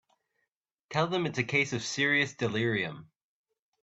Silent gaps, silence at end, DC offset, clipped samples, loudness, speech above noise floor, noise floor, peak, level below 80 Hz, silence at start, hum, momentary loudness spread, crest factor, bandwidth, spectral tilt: none; 0.8 s; under 0.1%; under 0.1%; -29 LUFS; 54 dB; -84 dBFS; -12 dBFS; -68 dBFS; 0.9 s; none; 8 LU; 20 dB; 8.2 kHz; -4.5 dB/octave